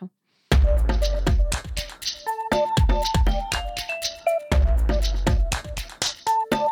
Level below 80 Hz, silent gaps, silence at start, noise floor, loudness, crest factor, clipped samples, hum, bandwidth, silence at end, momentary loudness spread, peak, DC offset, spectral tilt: -24 dBFS; none; 0 s; -42 dBFS; -24 LUFS; 16 dB; under 0.1%; none; 17.5 kHz; 0 s; 8 LU; -6 dBFS; under 0.1%; -4.5 dB/octave